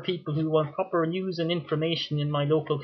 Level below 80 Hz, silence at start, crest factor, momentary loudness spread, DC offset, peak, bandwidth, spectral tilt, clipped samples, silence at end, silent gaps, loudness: -68 dBFS; 0 s; 16 dB; 3 LU; under 0.1%; -10 dBFS; 6.2 kHz; -8 dB/octave; under 0.1%; 0 s; none; -27 LUFS